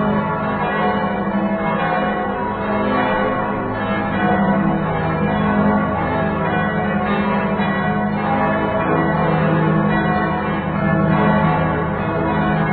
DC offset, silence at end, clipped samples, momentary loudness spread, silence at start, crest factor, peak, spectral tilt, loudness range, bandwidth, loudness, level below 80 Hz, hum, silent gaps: under 0.1%; 0 s; under 0.1%; 4 LU; 0 s; 14 dB; -2 dBFS; -11.5 dB/octave; 2 LU; 4.5 kHz; -18 LUFS; -38 dBFS; none; none